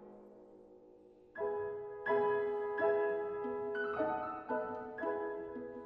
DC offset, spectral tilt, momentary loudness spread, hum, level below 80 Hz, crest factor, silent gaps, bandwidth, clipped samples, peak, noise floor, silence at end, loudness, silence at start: under 0.1%; -8 dB/octave; 11 LU; none; -74 dBFS; 16 dB; none; 4.8 kHz; under 0.1%; -22 dBFS; -61 dBFS; 0 s; -37 LUFS; 0 s